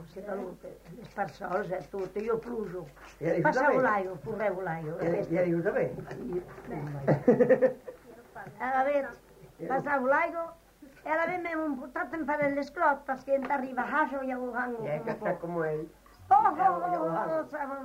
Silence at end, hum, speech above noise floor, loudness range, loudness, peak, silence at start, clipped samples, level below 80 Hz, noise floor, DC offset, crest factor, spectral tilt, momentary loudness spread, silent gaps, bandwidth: 0 s; none; 19 dB; 3 LU; -30 LUFS; -10 dBFS; 0 s; under 0.1%; -62 dBFS; -49 dBFS; under 0.1%; 20 dB; -7.5 dB/octave; 16 LU; none; 16 kHz